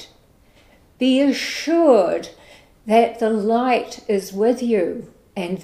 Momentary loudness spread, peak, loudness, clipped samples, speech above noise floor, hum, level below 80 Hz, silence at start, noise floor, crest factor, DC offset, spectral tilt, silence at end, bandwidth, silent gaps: 14 LU; -2 dBFS; -19 LUFS; under 0.1%; 35 dB; none; -58 dBFS; 0 s; -53 dBFS; 18 dB; under 0.1%; -5 dB/octave; 0 s; 15 kHz; none